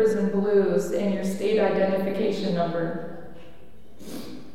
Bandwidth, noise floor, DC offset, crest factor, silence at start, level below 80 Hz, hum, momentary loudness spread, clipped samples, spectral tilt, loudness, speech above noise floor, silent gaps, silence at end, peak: 16 kHz; -51 dBFS; 2%; 16 dB; 0 s; -58 dBFS; none; 17 LU; under 0.1%; -6.5 dB/octave; -24 LUFS; 27 dB; none; 0.05 s; -10 dBFS